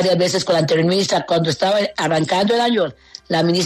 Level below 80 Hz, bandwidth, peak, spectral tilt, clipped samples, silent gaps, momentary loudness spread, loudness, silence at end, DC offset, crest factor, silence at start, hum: -56 dBFS; 13.5 kHz; -6 dBFS; -4.5 dB/octave; under 0.1%; none; 3 LU; -17 LUFS; 0 s; under 0.1%; 12 dB; 0 s; none